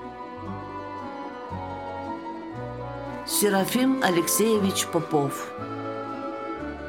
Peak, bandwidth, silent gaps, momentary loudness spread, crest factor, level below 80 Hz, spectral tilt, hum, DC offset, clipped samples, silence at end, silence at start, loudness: -6 dBFS; 19.5 kHz; none; 14 LU; 22 dB; -54 dBFS; -4 dB/octave; none; under 0.1%; under 0.1%; 0 s; 0 s; -27 LUFS